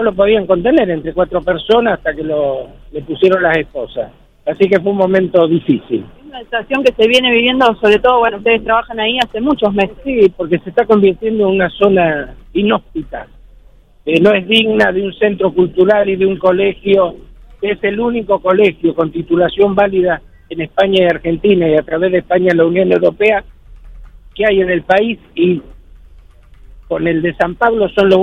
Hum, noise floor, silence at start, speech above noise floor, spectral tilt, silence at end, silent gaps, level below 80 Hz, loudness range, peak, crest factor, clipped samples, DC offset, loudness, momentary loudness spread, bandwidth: none; -43 dBFS; 0 s; 30 dB; -6.5 dB/octave; 0 s; none; -40 dBFS; 4 LU; 0 dBFS; 14 dB; under 0.1%; under 0.1%; -13 LUFS; 11 LU; 9.6 kHz